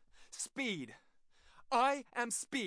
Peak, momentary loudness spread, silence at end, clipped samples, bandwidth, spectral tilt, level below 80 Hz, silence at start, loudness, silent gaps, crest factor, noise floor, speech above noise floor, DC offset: -20 dBFS; 14 LU; 0 s; under 0.1%; 10.5 kHz; -2 dB/octave; -74 dBFS; 0.15 s; -37 LUFS; none; 20 dB; -65 dBFS; 29 dB; under 0.1%